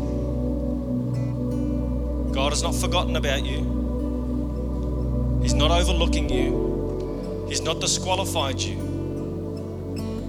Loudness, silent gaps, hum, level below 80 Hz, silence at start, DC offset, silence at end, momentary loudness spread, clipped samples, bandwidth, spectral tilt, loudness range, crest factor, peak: -25 LUFS; none; none; -28 dBFS; 0 s; under 0.1%; 0 s; 8 LU; under 0.1%; 14.5 kHz; -5 dB/octave; 2 LU; 18 dB; -6 dBFS